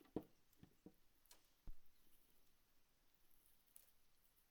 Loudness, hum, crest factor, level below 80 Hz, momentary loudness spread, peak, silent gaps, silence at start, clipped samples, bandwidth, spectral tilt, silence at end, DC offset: -62 LUFS; none; 30 dB; -70 dBFS; 13 LU; -32 dBFS; none; 0 s; under 0.1%; 19.5 kHz; -6 dB/octave; 0 s; under 0.1%